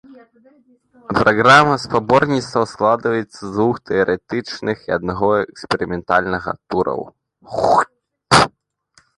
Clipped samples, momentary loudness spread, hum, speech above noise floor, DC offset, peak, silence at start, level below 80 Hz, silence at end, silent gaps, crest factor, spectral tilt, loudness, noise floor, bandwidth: under 0.1%; 11 LU; none; 40 dB; under 0.1%; 0 dBFS; 0.1 s; -46 dBFS; 0.7 s; none; 18 dB; -5 dB/octave; -17 LUFS; -57 dBFS; 11.5 kHz